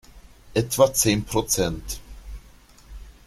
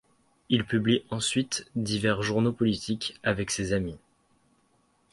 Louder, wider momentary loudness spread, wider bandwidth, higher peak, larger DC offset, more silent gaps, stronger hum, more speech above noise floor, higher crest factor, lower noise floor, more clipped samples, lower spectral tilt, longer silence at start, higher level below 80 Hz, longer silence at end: first, -22 LUFS vs -28 LUFS; first, 25 LU vs 5 LU; first, 16 kHz vs 11.5 kHz; first, -4 dBFS vs -10 dBFS; neither; neither; neither; second, 28 dB vs 40 dB; about the same, 22 dB vs 20 dB; second, -50 dBFS vs -68 dBFS; neither; about the same, -4 dB/octave vs -4.5 dB/octave; second, 0.15 s vs 0.5 s; first, -42 dBFS vs -54 dBFS; second, 0.15 s vs 1.15 s